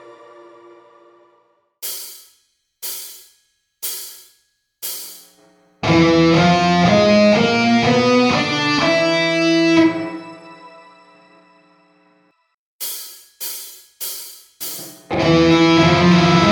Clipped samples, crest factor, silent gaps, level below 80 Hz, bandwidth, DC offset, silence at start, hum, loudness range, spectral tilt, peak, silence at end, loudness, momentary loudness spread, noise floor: under 0.1%; 16 dB; 12.54-12.79 s; -48 dBFS; over 20 kHz; under 0.1%; 1.8 s; none; 18 LU; -5 dB/octave; -2 dBFS; 0 s; -15 LUFS; 18 LU; -63 dBFS